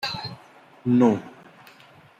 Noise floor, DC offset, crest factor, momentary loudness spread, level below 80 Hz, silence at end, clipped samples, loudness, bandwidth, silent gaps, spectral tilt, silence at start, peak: -51 dBFS; under 0.1%; 20 dB; 18 LU; -66 dBFS; 0.9 s; under 0.1%; -23 LUFS; 14 kHz; none; -7 dB/octave; 0 s; -6 dBFS